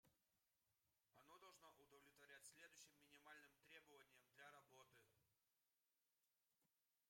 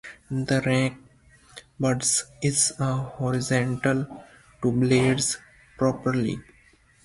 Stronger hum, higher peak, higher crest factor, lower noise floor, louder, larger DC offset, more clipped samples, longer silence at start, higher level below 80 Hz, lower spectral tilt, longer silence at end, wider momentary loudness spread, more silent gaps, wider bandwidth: neither; second, -52 dBFS vs -8 dBFS; about the same, 22 dB vs 18 dB; first, under -90 dBFS vs -58 dBFS; second, -67 LUFS vs -24 LUFS; neither; neither; about the same, 0.05 s vs 0.05 s; second, under -90 dBFS vs -54 dBFS; second, -1.5 dB/octave vs -4.5 dB/octave; second, 0 s vs 0.65 s; second, 4 LU vs 9 LU; neither; first, 16 kHz vs 11.5 kHz